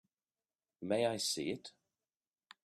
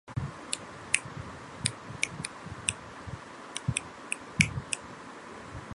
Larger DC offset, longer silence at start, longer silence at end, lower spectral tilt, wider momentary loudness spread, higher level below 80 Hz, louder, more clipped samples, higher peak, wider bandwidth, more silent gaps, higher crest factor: neither; first, 0.8 s vs 0.05 s; first, 0.95 s vs 0 s; about the same, -3.5 dB/octave vs -2.5 dB/octave; about the same, 15 LU vs 16 LU; second, -80 dBFS vs -52 dBFS; second, -37 LUFS vs -34 LUFS; neither; second, -20 dBFS vs 0 dBFS; first, 14 kHz vs 11.5 kHz; neither; second, 22 dB vs 36 dB